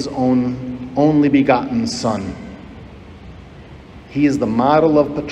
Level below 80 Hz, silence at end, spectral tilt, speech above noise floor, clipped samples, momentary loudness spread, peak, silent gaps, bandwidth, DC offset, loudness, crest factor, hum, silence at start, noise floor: -44 dBFS; 0 s; -6.5 dB/octave; 22 dB; under 0.1%; 20 LU; 0 dBFS; none; 9.6 kHz; under 0.1%; -16 LUFS; 16 dB; none; 0 s; -38 dBFS